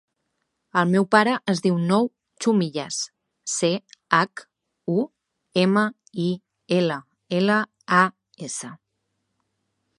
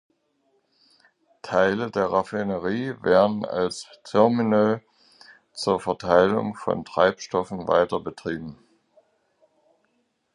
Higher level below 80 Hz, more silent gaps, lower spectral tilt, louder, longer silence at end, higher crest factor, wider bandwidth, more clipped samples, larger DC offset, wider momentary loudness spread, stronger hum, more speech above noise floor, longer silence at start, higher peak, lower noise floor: second, -72 dBFS vs -58 dBFS; neither; about the same, -5 dB/octave vs -6 dB/octave; about the same, -23 LUFS vs -23 LUFS; second, 1.25 s vs 1.8 s; about the same, 22 dB vs 22 dB; about the same, 11.5 kHz vs 11 kHz; neither; neither; about the same, 13 LU vs 12 LU; neither; first, 55 dB vs 48 dB; second, 0.75 s vs 1.45 s; about the same, -2 dBFS vs -2 dBFS; first, -76 dBFS vs -71 dBFS